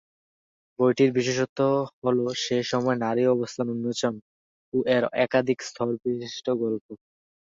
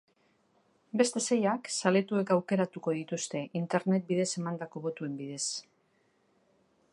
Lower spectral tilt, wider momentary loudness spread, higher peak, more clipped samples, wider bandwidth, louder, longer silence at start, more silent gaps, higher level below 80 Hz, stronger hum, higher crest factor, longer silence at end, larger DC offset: about the same, -5.5 dB/octave vs -4.5 dB/octave; about the same, 8 LU vs 9 LU; about the same, -8 dBFS vs -10 dBFS; neither; second, 7.8 kHz vs 11.5 kHz; first, -25 LUFS vs -31 LUFS; second, 0.8 s vs 0.95 s; first, 1.49-1.56 s, 1.93-2.02 s, 4.22-4.72 s, 6.81-6.89 s vs none; first, -68 dBFS vs -82 dBFS; neither; about the same, 18 dB vs 22 dB; second, 0.5 s vs 1.3 s; neither